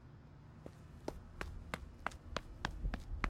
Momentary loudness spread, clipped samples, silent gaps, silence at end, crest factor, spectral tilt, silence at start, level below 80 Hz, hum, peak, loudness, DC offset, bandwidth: 12 LU; under 0.1%; none; 0 s; 28 dB; -5 dB/octave; 0 s; -48 dBFS; none; -18 dBFS; -47 LUFS; under 0.1%; 15.5 kHz